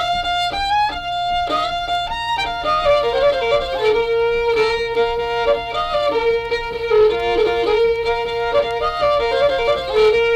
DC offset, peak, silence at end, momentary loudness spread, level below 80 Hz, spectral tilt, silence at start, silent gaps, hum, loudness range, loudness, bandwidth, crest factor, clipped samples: under 0.1%; -6 dBFS; 0 s; 5 LU; -38 dBFS; -3.5 dB/octave; 0 s; none; none; 1 LU; -18 LUFS; 10.5 kHz; 12 dB; under 0.1%